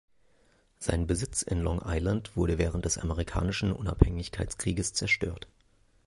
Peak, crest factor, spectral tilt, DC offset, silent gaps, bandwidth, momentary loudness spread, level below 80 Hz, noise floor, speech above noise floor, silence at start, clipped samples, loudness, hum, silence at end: -2 dBFS; 28 dB; -5 dB/octave; under 0.1%; none; 11.5 kHz; 8 LU; -36 dBFS; -66 dBFS; 37 dB; 0.8 s; under 0.1%; -30 LUFS; none; 0.65 s